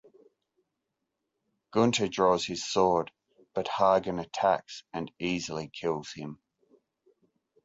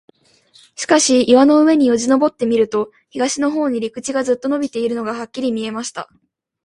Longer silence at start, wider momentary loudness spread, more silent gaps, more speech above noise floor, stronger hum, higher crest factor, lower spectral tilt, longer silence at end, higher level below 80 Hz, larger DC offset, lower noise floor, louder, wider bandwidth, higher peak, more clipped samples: first, 1.75 s vs 0.8 s; about the same, 14 LU vs 14 LU; neither; first, 56 dB vs 37 dB; neither; first, 22 dB vs 16 dB; first, -4.5 dB/octave vs -3 dB/octave; first, 1.3 s vs 0.6 s; about the same, -64 dBFS vs -60 dBFS; neither; first, -84 dBFS vs -52 dBFS; second, -29 LUFS vs -16 LUFS; second, 8 kHz vs 11.5 kHz; second, -10 dBFS vs 0 dBFS; neither